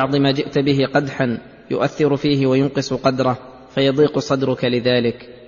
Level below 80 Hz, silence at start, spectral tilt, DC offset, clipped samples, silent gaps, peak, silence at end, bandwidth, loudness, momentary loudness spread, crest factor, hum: -52 dBFS; 0 s; -6.5 dB/octave; under 0.1%; under 0.1%; none; -4 dBFS; 0 s; 7.4 kHz; -18 LUFS; 6 LU; 14 dB; none